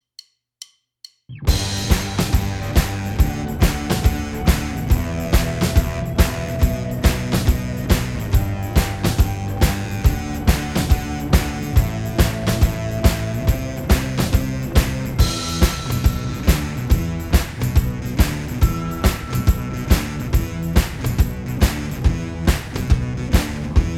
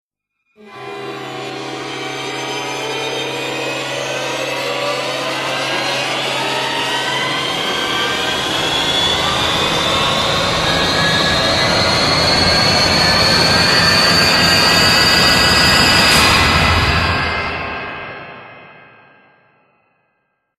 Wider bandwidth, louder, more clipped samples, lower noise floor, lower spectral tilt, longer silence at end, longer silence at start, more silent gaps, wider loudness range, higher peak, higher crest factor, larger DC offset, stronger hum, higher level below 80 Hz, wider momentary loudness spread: about the same, 17 kHz vs 15.5 kHz; second, -20 LUFS vs -13 LUFS; neither; second, -47 dBFS vs -70 dBFS; first, -5.5 dB/octave vs -2.5 dB/octave; second, 0 s vs 1.85 s; first, 1.3 s vs 0.65 s; neither; second, 1 LU vs 12 LU; about the same, 0 dBFS vs 0 dBFS; about the same, 18 dB vs 16 dB; neither; neither; first, -22 dBFS vs -36 dBFS; second, 3 LU vs 15 LU